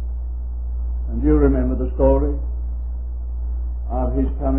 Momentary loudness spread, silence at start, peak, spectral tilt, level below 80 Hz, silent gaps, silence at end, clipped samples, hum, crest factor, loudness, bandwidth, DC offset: 12 LU; 0 s; -2 dBFS; -14 dB/octave; -22 dBFS; none; 0 s; under 0.1%; none; 18 dB; -22 LUFS; 2.7 kHz; 1%